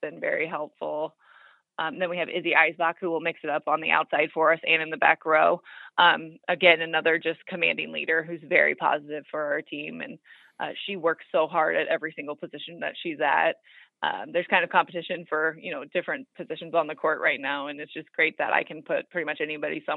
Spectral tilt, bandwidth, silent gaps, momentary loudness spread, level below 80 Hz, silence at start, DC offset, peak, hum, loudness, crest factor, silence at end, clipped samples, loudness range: -7 dB/octave; 4.7 kHz; none; 14 LU; -86 dBFS; 0 s; under 0.1%; -2 dBFS; none; -25 LUFS; 24 dB; 0 s; under 0.1%; 6 LU